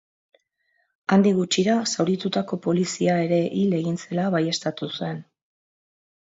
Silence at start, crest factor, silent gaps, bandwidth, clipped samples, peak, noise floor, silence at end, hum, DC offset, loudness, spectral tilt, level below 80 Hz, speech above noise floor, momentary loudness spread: 1.1 s; 16 dB; none; 8 kHz; under 0.1%; -8 dBFS; -70 dBFS; 1.1 s; none; under 0.1%; -23 LUFS; -5.5 dB/octave; -68 dBFS; 48 dB; 10 LU